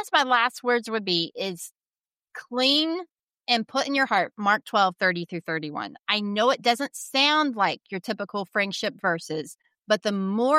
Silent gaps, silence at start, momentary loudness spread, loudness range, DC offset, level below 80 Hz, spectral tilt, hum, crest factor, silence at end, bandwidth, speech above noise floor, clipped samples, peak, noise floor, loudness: 1.88-1.92 s, 3.23-3.27 s; 0 s; 13 LU; 2 LU; under 0.1%; -80 dBFS; -3.5 dB/octave; none; 20 dB; 0 s; 16 kHz; over 65 dB; under 0.1%; -6 dBFS; under -90 dBFS; -24 LUFS